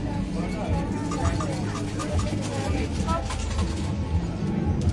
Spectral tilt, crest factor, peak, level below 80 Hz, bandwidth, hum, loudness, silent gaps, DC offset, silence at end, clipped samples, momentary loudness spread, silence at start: -6.5 dB/octave; 14 dB; -12 dBFS; -34 dBFS; 11.5 kHz; none; -28 LUFS; none; under 0.1%; 0 s; under 0.1%; 3 LU; 0 s